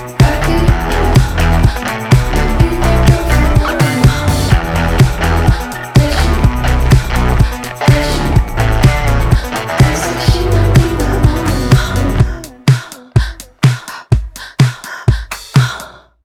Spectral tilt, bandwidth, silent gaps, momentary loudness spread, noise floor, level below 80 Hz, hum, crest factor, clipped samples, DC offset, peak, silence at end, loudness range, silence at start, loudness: -6 dB/octave; 16.5 kHz; none; 5 LU; -32 dBFS; -16 dBFS; none; 12 dB; under 0.1%; under 0.1%; 0 dBFS; 0.35 s; 3 LU; 0 s; -13 LUFS